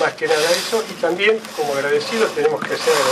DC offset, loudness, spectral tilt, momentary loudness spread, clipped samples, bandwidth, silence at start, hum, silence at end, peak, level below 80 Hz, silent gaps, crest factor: under 0.1%; -18 LUFS; -2.5 dB/octave; 5 LU; under 0.1%; 15.5 kHz; 0 s; none; 0 s; -4 dBFS; -66 dBFS; none; 16 dB